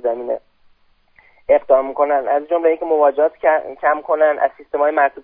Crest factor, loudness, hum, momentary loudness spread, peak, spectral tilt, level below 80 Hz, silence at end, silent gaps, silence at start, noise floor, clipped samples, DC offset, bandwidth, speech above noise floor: 16 dB; -17 LUFS; none; 7 LU; 0 dBFS; -8 dB/octave; -56 dBFS; 0.05 s; none; 0 s; -55 dBFS; under 0.1%; under 0.1%; 3.7 kHz; 39 dB